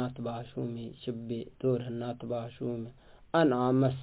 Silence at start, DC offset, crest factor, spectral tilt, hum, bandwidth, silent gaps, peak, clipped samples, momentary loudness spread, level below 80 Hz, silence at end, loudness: 0 s; under 0.1%; 18 dB; -7 dB/octave; none; 4 kHz; none; -14 dBFS; under 0.1%; 13 LU; -62 dBFS; 0 s; -33 LUFS